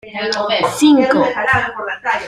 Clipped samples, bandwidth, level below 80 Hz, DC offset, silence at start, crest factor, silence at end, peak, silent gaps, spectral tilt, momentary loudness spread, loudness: under 0.1%; 13.5 kHz; -50 dBFS; under 0.1%; 0.05 s; 14 dB; 0 s; -2 dBFS; none; -4 dB/octave; 9 LU; -15 LUFS